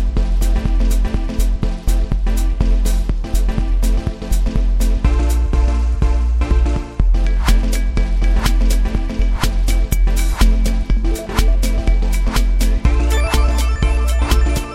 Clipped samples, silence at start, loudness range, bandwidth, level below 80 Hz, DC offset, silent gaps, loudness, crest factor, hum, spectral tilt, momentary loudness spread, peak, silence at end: under 0.1%; 0 s; 2 LU; 15 kHz; -14 dBFS; under 0.1%; none; -18 LUFS; 14 dB; none; -5.5 dB/octave; 4 LU; 0 dBFS; 0 s